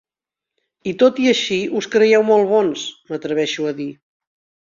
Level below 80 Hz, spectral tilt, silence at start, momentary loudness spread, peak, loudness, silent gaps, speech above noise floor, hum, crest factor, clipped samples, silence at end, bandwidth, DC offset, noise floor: -64 dBFS; -4 dB/octave; 0.85 s; 14 LU; -2 dBFS; -17 LUFS; none; 70 dB; none; 16 dB; under 0.1%; 0.75 s; 7.6 kHz; under 0.1%; -87 dBFS